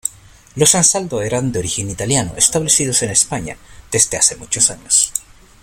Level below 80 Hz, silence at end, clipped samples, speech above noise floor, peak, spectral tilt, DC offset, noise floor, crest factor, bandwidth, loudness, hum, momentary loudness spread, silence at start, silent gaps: -44 dBFS; 0.4 s; under 0.1%; 26 dB; 0 dBFS; -2.5 dB/octave; under 0.1%; -42 dBFS; 18 dB; over 20 kHz; -14 LUFS; none; 10 LU; 0.05 s; none